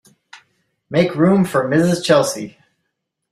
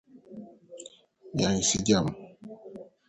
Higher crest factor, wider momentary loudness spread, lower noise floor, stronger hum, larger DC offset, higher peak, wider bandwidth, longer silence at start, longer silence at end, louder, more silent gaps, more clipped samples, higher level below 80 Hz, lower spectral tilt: second, 16 dB vs 22 dB; second, 9 LU vs 23 LU; first, -75 dBFS vs -52 dBFS; neither; neither; first, -2 dBFS vs -10 dBFS; first, 15 kHz vs 9 kHz; first, 0.35 s vs 0.15 s; first, 0.85 s vs 0.25 s; first, -16 LUFS vs -26 LUFS; neither; neither; about the same, -56 dBFS vs -54 dBFS; first, -5.5 dB/octave vs -4 dB/octave